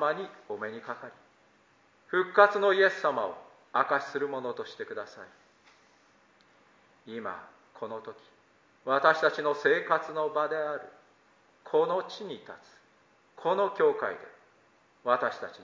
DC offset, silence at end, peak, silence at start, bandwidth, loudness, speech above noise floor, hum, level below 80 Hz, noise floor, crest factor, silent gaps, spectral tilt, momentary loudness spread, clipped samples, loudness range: under 0.1%; 0 s; -6 dBFS; 0 s; 7.6 kHz; -29 LUFS; 35 dB; none; -84 dBFS; -64 dBFS; 24 dB; none; -5 dB/octave; 20 LU; under 0.1%; 16 LU